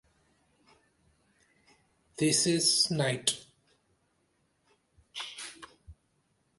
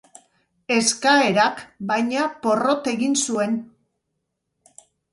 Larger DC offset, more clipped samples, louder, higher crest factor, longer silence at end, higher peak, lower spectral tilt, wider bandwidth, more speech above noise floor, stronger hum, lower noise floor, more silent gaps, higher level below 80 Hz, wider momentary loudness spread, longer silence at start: neither; neither; second, -28 LUFS vs -20 LUFS; about the same, 24 dB vs 20 dB; second, 0.65 s vs 1.5 s; second, -10 dBFS vs -4 dBFS; about the same, -3 dB/octave vs -3 dB/octave; about the same, 12 kHz vs 11.5 kHz; second, 46 dB vs 57 dB; neither; about the same, -74 dBFS vs -77 dBFS; neither; about the same, -66 dBFS vs -70 dBFS; first, 24 LU vs 8 LU; first, 2.2 s vs 0.7 s